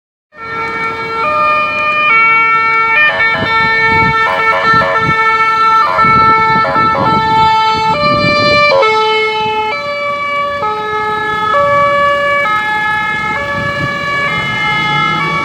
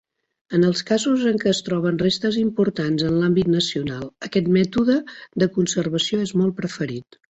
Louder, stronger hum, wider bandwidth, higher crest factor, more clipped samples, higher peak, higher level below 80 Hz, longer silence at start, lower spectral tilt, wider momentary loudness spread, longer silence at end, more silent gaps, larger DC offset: first, -10 LUFS vs -21 LUFS; neither; first, 16 kHz vs 8.2 kHz; about the same, 12 dB vs 16 dB; neither; first, 0 dBFS vs -4 dBFS; first, -40 dBFS vs -54 dBFS; second, 0.35 s vs 0.5 s; about the same, -4.5 dB/octave vs -5.5 dB/octave; about the same, 8 LU vs 8 LU; second, 0 s vs 0.35 s; neither; neither